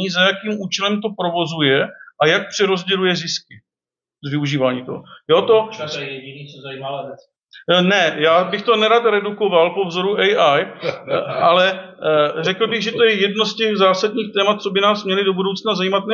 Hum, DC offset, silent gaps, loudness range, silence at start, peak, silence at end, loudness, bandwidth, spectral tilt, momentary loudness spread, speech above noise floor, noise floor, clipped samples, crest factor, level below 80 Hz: none; under 0.1%; none; 5 LU; 0 s; -2 dBFS; 0 s; -17 LUFS; 7.4 kHz; -4.5 dB/octave; 13 LU; over 73 dB; under -90 dBFS; under 0.1%; 16 dB; -70 dBFS